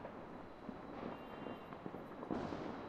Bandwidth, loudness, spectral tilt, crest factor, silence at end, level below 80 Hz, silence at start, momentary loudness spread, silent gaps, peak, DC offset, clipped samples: 14.5 kHz; -48 LUFS; -7.5 dB/octave; 20 dB; 0 s; -68 dBFS; 0 s; 8 LU; none; -28 dBFS; under 0.1%; under 0.1%